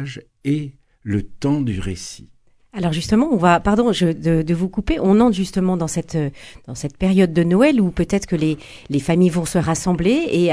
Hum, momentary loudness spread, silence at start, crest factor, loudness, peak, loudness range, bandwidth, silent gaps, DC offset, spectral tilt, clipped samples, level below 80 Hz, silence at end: none; 14 LU; 0 s; 18 dB; -18 LUFS; -2 dBFS; 3 LU; 11 kHz; none; under 0.1%; -6.5 dB/octave; under 0.1%; -38 dBFS; 0 s